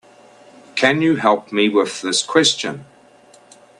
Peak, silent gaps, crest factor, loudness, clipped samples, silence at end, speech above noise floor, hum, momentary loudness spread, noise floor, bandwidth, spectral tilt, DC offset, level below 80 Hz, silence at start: 0 dBFS; none; 20 dB; -17 LUFS; under 0.1%; 0.95 s; 31 dB; none; 11 LU; -48 dBFS; 11.5 kHz; -3 dB/octave; under 0.1%; -64 dBFS; 0.75 s